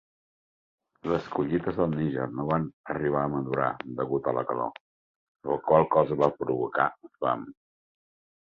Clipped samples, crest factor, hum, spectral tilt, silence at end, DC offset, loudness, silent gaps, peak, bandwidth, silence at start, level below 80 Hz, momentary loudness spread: under 0.1%; 24 dB; none; -9 dB/octave; 0.95 s; under 0.1%; -28 LUFS; 2.73-2.84 s, 4.81-5.35 s; -6 dBFS; 7 kHz; 1.05 s; -58 dBFS; 10 LU